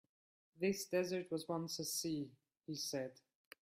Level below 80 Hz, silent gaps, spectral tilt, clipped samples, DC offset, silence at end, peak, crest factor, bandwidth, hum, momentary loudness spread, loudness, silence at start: -80 dBFS; none; -4 dB/octave; under 0.1%; under 0.1%; 0.5 s; -26 dBFS; 18 dB; 16 kHz; none; 11 LU; -42 LUFS; 0.55 s